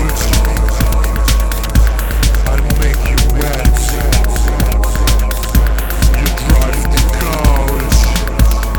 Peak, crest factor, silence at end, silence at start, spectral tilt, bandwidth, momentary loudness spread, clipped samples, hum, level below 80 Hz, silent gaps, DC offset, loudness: 0 dBFS; 10 dB; 0 s; 0 s; -4.5 dB/octave; 19 kHz; 2 LU; under 0.1%; none; -12 dBFS; none; under 0.1%; -14 LUFS